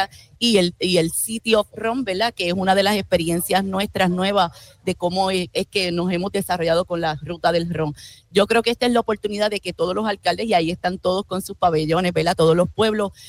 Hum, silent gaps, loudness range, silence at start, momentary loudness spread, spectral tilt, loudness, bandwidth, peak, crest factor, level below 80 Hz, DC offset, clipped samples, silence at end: none; none; 2 LU; 0 s; 7 LU; -4.5 dB/octave; -20 LUFS; 16.5 kHz; -4 dBFS; 16 dB; -48 dBFS; under 0.1%; under 0.1%; 0 s